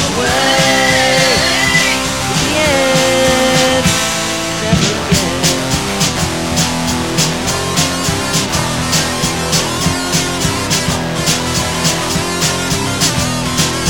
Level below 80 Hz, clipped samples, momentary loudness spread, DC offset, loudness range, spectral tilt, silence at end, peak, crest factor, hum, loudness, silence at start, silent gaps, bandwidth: -32 dBFS; under 0.1%; 5 LU; 0.9%; 3 LU; -3 dB/octave; 0 s; 0 dBFS; 14 dB; none; -13 LUFS; 0 s; none; 17.5 kHz